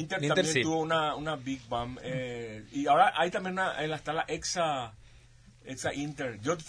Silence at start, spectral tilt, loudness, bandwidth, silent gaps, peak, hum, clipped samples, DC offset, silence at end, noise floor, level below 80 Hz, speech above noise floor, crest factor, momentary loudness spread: 0 s; -4 dB/octave; -30 LUFS; 11 kHz; none; -10 dBFS; none; under 0.1%; under 0.1%; 0 s; -56 dBFS; -58 dBFS; 26 dB; 20 dB; 11 LU